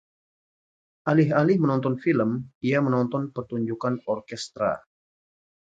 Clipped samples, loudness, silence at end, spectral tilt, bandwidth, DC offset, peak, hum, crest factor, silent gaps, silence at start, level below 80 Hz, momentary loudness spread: under 0.1%; -25 LUFS; 1 s; -7.5 dB/octave; 9.2 kHz; under 0.1%; -6 dBFS; none; 20 dB; 2.55-2.61 s; 1.05 s; -66 dBFS; 10 LU